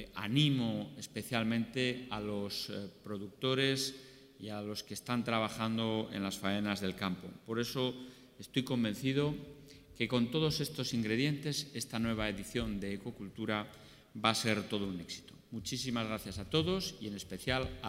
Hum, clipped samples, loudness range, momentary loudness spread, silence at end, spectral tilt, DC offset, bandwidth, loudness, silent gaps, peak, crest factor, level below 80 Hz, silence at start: none; under 0.1%; 2 LU; 13 LU; 0 s; -5 dB/octave; under 0.1%; 16 kHz; -36 LUFS; none; -12 dBFS; 24 dB; -60 dBFS; 0 s